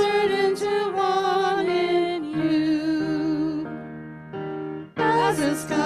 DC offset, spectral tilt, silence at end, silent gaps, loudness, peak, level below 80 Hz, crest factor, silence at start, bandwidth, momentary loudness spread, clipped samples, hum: under 0.1%; -5 dB/octave; 0 s; none; -23 LUFS; -10 dBFS; -60 dBFS; 14 dB; 0 s; 14 kHz; 13 LU; under 0.1%; none